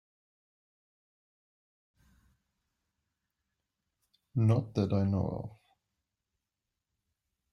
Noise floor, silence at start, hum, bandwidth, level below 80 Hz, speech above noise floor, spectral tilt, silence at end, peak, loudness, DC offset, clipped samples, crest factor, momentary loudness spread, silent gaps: -88 dBFS; 4.35 s; none; 6.4 kHz; -66 dBFS; 59 dB; -9.5 dB/octave; 2.05 s; -16 dBFS; -31 LUFS; under 0.1%; under 0.1%; 22 dB; 12 LU; none